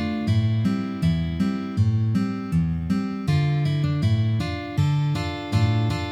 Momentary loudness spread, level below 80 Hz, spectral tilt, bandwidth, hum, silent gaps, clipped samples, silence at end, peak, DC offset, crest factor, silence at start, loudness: 4 LU; -42 dBFS; -7.5 dB/octave; 10.5 kHz; none; none; under 0.1%; 0 s; -10 dBFS; under 0.1%; 14 dB; 0 s; -23 LUFS